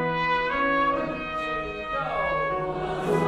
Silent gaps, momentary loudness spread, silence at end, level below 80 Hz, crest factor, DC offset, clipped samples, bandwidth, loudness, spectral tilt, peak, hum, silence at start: none; 6 LU; 0 s; -46 dBFS; 16 dB; under 0.1%; under 0.1%; 14 kHz; -26 LUFS; -6 dB/octave; -10 dBFS; none; 0 s